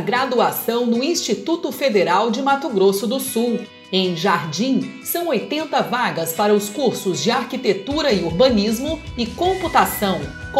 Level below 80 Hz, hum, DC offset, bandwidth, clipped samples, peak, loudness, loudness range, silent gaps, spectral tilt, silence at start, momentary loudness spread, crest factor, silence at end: -44 dBFS; none; under 0.1%; 16 kHz; under 0.1%; -2 dBFS; -19 LUFS; 2 LU; none; -4 dB/octave; 0 s; 6 LU; 18 dB; 0 s